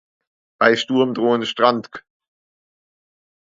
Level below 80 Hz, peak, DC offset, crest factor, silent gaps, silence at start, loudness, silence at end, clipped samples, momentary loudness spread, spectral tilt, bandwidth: -70 dBFS; 0 dBFS; under 0.1%; 22 dB; none; 0.6 s; -18 LUFS; 1.55 s; under 0.1%; 7 LU; -5 dB/octave; 7.8 kHz